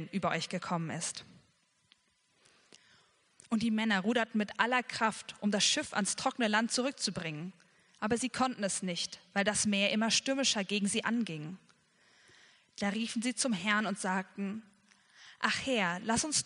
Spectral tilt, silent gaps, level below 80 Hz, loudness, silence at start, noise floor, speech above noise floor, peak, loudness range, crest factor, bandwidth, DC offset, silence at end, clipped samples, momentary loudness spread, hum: -3 dB/octave; none; -70 dBFS; -32 LUFS; 0 s; -72 dBFS; 40 dB; -10 dBFS; 5 LU; 24 dB; 10.5 kHz; under 0.1%; 0 s; under 0.1%; 11 LU; none